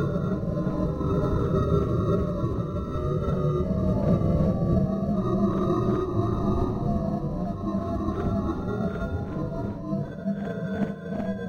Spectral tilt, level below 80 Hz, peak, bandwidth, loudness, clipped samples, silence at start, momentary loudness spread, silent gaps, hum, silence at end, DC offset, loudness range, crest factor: -10 dB/octave; -36 dBFS; -10 dBFS; 6.8 kHz; -27 LUFS; under 0.1%; 0 s; 7 LU; none; none; 0 s; 0.2%; 5 LU; 16 dB